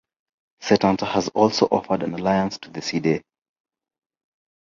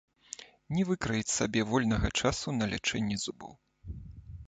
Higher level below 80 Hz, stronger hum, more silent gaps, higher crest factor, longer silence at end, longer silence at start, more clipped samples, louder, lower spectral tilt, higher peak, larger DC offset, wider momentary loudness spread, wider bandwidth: second, -56 dBFS vs -46 dBFS; neither; neither; about the same, 22 dB vs 20 dB; first, 1.5 s vs 0.05 s; first, 0.6 s vs 0.4 s; neither; first, -22 LUFS vs -31 LUFS; first, -5.5 dB/octave vs -4 dB/octave; first, -2 dBFS vs -14 dBFS; neither; second, 9 LU vs 18 LU; second, 7.6 kHz vs 9.4 kHz